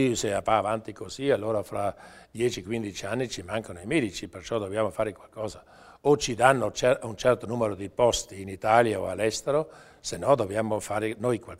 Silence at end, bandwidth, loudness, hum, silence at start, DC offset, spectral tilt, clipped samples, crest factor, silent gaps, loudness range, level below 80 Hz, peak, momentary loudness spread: 0.05 s; 16 kHz; -27 LUFS; none; 0 s; under 0.1%; -4.5 dB/octave; under 0.1%; 24 dB; none; 6 LU; -54 dBFS; -4 dBFS; 14 LU